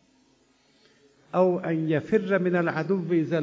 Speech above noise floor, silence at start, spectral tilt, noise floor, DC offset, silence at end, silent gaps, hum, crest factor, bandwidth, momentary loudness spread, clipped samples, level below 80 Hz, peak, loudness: 39 dB; 1.35 s; -8.5 dB/octave; -63 dBFS; under 0.1%; 0 s; none; none; 16 dB; 7.6 kHz; 4 LU; under 0.1%; -70 dBFS; -10 dBFS; -25 LUFS